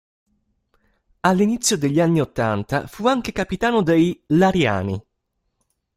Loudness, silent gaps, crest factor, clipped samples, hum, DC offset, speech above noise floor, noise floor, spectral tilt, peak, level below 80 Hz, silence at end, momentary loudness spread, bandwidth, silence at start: -20 LUFS; none; 18 dB; under 0.1%; none; under 0.1%; 55 dB; -74 dBFS; -5 dB/octave; -2 dBFS; -48 dBFS; 0.95 s; 8 LU; 16 kHz; 1.25 s